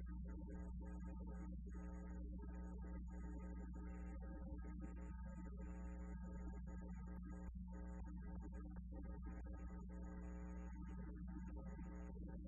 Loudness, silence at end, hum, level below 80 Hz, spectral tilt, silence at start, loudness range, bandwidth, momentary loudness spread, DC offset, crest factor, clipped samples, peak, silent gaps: -54 LUFS; 0 s; none; -52 dBFS; -9.5 dB/octave; 0 s; 1 LU; 7.4 kHz; 1 LU; under 0.1%; 12 dB; under 0.1%; -40 dBFS; none